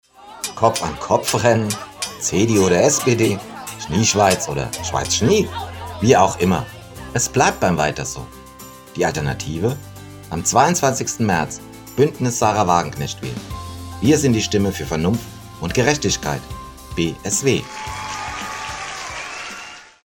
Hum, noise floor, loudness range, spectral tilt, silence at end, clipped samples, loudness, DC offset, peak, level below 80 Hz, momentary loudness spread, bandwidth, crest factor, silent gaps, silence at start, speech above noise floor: none; -39 dBFS; 4 LU; -4 dB/octave; 0.2 s; under 0.1%; -19 LUFS; under 0.1%; 0 dBFS; -42 dBFS; 16 LU; 17.5 kHz; 20 dB; none; 0.2 s; 21 dB